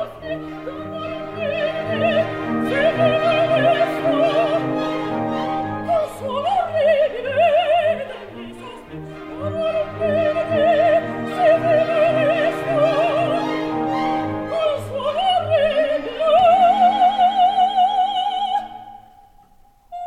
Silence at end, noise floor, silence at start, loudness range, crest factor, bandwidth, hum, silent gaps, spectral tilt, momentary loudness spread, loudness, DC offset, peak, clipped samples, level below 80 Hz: 0 s; -52 dBFS; 0 s; 5 LU; 14 dB; 12 kHz; none; none; -6 dB/octave; 14 LU; -19 LUFS; under 0.1%; -4 dBFS; under 0.1%; -50 dBFS